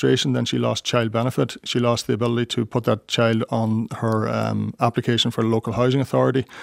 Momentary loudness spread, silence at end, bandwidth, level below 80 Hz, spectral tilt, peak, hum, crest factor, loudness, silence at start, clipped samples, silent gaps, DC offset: 4 LU; 0 s; 15.5 kHz; -58 dBFS; -5.5 dB/octave; -4 dBFS; none; 18 dB; -21 LUFS; 0 s; under 0.1%; none; under 0.1%